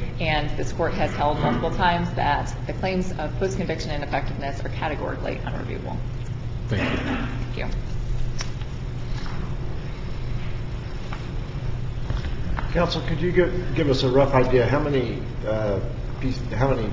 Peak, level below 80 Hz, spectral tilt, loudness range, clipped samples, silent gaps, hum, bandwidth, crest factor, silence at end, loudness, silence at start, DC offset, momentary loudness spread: -6 dBFS; -32 dBFS; -6.5 dB/octave; 9 LU; under 0.1%; none; none; 7.6 kHz; 18 dB; 0 s; -26 LUFS; 0 s; under 0.1%; 11 LU